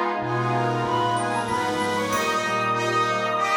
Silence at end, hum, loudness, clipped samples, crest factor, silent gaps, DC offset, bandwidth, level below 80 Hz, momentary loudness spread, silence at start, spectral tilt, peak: 0 s; none; -23 LUFS; under 0.1%; 12 dB; none; under 0.1%; over 20 kHz; -58 dBFS; 2 LU; 0 s; -4.5 dB/octave; -10 dBFS